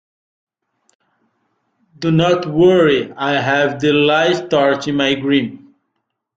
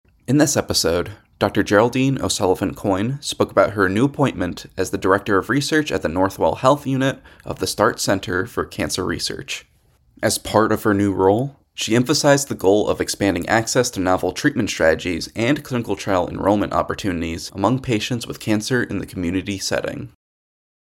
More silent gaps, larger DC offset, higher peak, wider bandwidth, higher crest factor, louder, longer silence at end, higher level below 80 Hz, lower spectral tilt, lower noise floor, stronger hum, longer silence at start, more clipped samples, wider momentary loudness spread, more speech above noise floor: neither; neither; about the same, -2 dBFS vs -2 dBFS; second, 7.8 kHz vs 17 kHz; about the same, 16 dB vs 18 dB; first, -15 LUFS vs -20 LUFS; about the same, 0.8 s vs 0.8 s; second, -54 dBFS vs -48 dBFS; first, -6 dB/octave vs -4.5 dB/octave; first, -73 dBFS vs -54 dBFS; neither; first, 2 s vs 0.3 s; neither; second, 6 LU vs 9 LU; first, 59 dB vs 35 dB